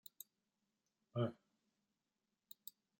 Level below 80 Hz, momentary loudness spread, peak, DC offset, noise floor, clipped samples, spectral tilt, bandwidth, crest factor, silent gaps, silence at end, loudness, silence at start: under -90 dBFS; 19 LU; -26 dBFS; under 0.1%; under -90 dBFS; under 0.1%; -6.5 dB/octave; 16.5 kHz; 24 dB; none; 1.65 s; -47 LUFS; 1.15 s